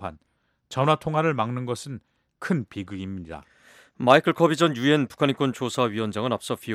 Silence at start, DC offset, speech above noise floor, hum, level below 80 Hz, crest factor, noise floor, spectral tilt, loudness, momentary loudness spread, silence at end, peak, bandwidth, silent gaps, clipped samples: 0 s; under 0.1%; 47 dB; none; -60 dBFS; 22 dB; -70 dBFS; -6 dB/octave; -24 LUFS; 18 LU; 0 s; -2 dBFS; 15.5 kHz; none; under 0.1%